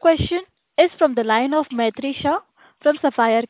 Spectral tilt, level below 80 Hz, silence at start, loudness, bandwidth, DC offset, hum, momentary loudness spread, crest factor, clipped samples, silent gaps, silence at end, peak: -9.5 dB/octave; -44 dBFS; 0.05 s; -20 LUFS; 4 kHz; under 0.1%; none; 8 LU; 18 dB; under 0.1%; none; 0.05 s; -2 dBFS